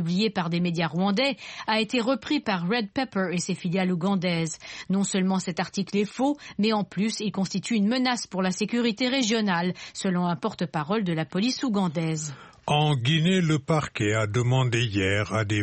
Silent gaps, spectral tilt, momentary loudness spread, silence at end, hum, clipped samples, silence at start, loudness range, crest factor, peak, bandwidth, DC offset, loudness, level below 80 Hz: none; -5 dB/octave; 6 LU; 0 s; none; under 0.1%; 0 s; 2 LU; 16 dB; -10 dBFS; 8.8 kHz; under 0.1%; -26 LUFS; -60 dBFS